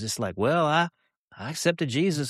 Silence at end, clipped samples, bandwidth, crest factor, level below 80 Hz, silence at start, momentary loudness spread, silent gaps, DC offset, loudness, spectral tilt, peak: 0 s; under 0.1%; 13.5 kHz; 18 dB; -64 dBFS; 0 s; 10 LU; 1.17-1.28 s; under 0.1%; -25 LUFS; -4.5 dB/octave; -8 dBFS